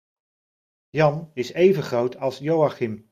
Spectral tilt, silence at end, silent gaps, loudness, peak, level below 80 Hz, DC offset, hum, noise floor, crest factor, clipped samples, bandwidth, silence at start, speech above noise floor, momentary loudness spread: -7 dB/octave; 0.15 s; none; -22 LUFS; -6 dBFS; -64 dBFS; under 0.1%; none; under -90 dBFS; 18 dB; under 0.1%; 14.5 kHz; 0.95 s; over 68 dB; 11 LU